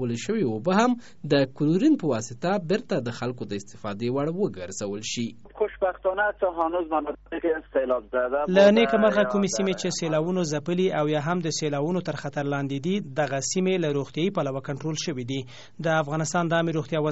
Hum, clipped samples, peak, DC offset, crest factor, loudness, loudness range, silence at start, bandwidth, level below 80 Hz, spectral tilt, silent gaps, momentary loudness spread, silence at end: none; under 0.1%; -6 dBFS; 0.4%; 18 dB; -25 LUFS; 6 LU; 0 s; 8 kHz; -58 dBFS; -5 dB/octave; none; 10 LU; 0 s